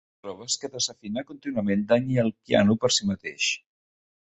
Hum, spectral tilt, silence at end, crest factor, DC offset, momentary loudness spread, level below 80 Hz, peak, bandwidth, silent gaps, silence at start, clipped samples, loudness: none; -4 dB/octave; 0.65 s; 20 dB; under 0.1%; 12 LU; -58 dBFS; -6 dBFS; 8.4 kHz; none; 0.25 s; under 0.1%; -25 LUFS